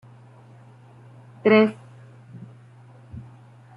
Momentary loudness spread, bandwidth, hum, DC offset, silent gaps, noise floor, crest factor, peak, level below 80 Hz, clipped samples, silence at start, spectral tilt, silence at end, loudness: 28 LU; 5.4 kHz; none; under 0.1%; none; -48 dBFS; 22 dB; -4 dBFS; -64 dBFS; under 0.1%; 1.45 s; -8 dB/octave; 0.55 s; -19 LUFS